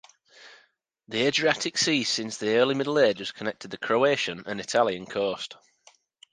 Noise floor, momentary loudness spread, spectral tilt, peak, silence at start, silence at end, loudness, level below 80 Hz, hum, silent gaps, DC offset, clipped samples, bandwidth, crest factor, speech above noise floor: -65 dBFS; 11 LU; -3 dB/octave; -6 dBFS; 0.4 s; 0.8 s; -25 LUFS; -70 dBFS; none; none; under 0.1%; under 0.1%; 10 kHz; 20 dB; 39 dB